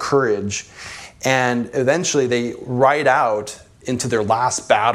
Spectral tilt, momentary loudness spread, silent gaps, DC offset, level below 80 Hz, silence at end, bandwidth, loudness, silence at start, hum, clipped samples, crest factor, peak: -4 dB/octave; 14 LU; none; under 0.1%; -56 dBFS; 0 s; 15 kHz; -19 LUFS; 0 s; none; under 0.1%; 18 dB; 0 dBFS